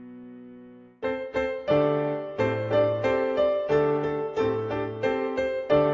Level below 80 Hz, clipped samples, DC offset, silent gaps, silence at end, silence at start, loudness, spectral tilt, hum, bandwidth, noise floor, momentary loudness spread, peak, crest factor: -54 dBFS; under 0.1%; under 0.1%; none; 0 s; 0 s; -26 LUFS; -7.5 dB/octave; none; 7.4 kHz; -48 dBFS; 10 LU; -8 dBFS; 16 dB